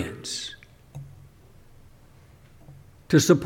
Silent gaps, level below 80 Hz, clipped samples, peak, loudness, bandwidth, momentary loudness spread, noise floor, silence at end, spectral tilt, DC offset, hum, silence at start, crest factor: none; -54 dBFS; under 0.1%; -6 dBFS; -25 LUFS; 18 kHz; 26 LU; -52 dBFS; 0 s; -5 dB/octave; under 0.1%; none; 0 s; 22 dB